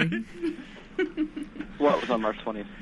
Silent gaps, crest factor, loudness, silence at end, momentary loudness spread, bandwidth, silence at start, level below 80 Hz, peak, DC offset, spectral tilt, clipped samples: none; 20 dB; -29 LUFS; 0 s; 13 LU; 11 kHz; 0 s; -52 dBFS; -8 dBFS; under 0.1%; -6.5 dB/octave; under 0.1%